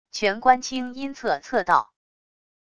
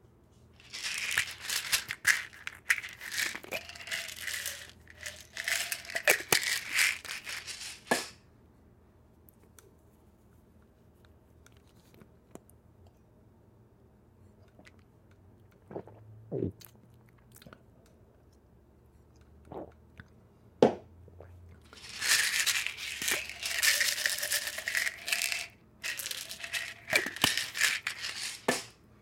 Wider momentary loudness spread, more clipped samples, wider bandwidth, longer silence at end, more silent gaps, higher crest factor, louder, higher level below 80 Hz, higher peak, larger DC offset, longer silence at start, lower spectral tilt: second, 10 LU vs 19 LU; neither; second, 10.5 kHz vs 17 kHz; first, 0.75 s vs 0.3 s; neither; second, 22 dB vs 32 dB; first, -23 LUFS vs -31 LUFS; first, -60 dBFS vs -66 dBFS; about the same, -4 dBFS vs -4 dBFS; first, 0.4% vs under 0.1%; second, 0.15 s vs 0.65 s; first, -3 dB/octave vs -1 dB/octave